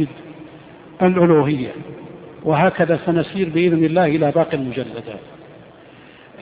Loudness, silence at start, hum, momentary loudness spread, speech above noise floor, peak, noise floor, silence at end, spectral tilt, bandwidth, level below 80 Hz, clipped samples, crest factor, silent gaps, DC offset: -18 LUFS; 0 s; none; 22 LU; 27 dB; -2 dBFS; -44 dBFS; 0 s; -6.5 dB/octave; 4.9 kHz; -54 dBFS; under 0.1%; 18 dB; none; under 0.1%